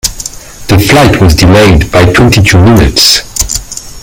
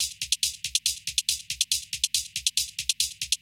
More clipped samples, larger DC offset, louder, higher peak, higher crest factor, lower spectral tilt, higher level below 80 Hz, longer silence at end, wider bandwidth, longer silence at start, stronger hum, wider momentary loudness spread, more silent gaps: first, 5% vs under 0.1%; neither; first, -5 LUFS vs -26 LUFS; first, 0 dBFS vs -6 dBFS; second, 6 dB vs 24 dB; first, -4.5 dB/octave vs 4.5 dB/octave; first, -18 dBFS vs -56 dBFS; about the same, 0 s vs 0.05 s; first, over 20 kHz vs 16.5 kHz; about the same, 0.05 s vs 0 s; neither; first, 13 LU vs 1 LU; neither